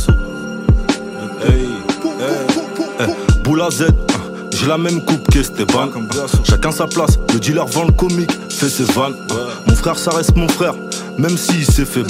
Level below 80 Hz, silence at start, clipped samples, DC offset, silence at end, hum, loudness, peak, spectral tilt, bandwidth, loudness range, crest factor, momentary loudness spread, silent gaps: -22 dBFS; 0 s; under 0.1%; under 0.1%; 0 s; none; -16 LUFS; 0 dBFS; -5 dB/octave; 16 kHz; 2 LU; 14 dB; 6 LU; none